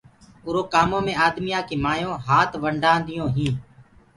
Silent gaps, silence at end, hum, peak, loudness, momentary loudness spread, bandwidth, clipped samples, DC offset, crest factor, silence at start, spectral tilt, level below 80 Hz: none; 0.35 s; none; -4 dBFS; -22 LUFS; 7 LU; 11.5 kHz; under 0.1%; under 0.1%; 18 dB; 0.45 s; -5.5 dB/octave; -46 dBFS